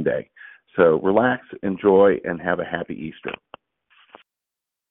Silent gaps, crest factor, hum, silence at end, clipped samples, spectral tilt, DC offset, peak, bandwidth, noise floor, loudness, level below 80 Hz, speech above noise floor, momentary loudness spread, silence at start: none; 20 dB; none; 1.55 s; under 0.1%; -11 dB/octave; under 0.1%; -4 dBFS; 3.9 kHz; -86 dBFS; -21 LUFS; -60 dBFS; 66 dB; 17 LU; 0 s